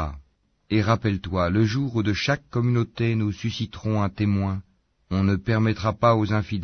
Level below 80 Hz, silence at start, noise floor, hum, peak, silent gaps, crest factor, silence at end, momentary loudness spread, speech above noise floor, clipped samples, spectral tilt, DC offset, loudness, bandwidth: -46 dBFS; 0 s; -61 dBFS; none; -6 dBFS; none; 16 dB; 0 s; 7 LU; 38 dB; under 0.1%; -7 dB/octave; under 0.1%; -24 LUFS; 6.6 kHz